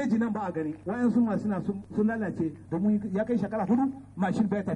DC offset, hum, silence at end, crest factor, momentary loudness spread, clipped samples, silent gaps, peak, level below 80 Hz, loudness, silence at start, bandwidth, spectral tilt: under 0.1%; none; 0 s; 14 dB; 6 LU; under 0.1%; none; -14 dBFS; -60 dBFS; -28 LUFS; 0 s; 9 kHz; -9 dB/octave